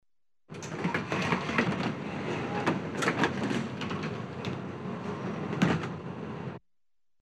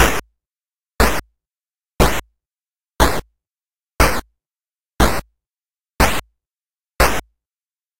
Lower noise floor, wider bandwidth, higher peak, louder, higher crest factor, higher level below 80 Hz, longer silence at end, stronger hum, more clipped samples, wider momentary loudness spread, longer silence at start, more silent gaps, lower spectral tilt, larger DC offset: about the same, under -90 dBFS vs under -90 dBFS; second, 12.5 kHz vs 16.5 kHz; second, -12 dBFS vs 0 dBFS; second, -32 LUFS vs -19 LUFS; about the same, 22 dB vs 20 dB; second, -64 dBFS vs -26 dBFS; first, 0.65 s vs 0 s; neither; neither; about the same, 11 LU vs 10 LU; first, 0.5 s vs 0 s; neither; first, -5.5 dB/octave vs -4 dB/octave; neither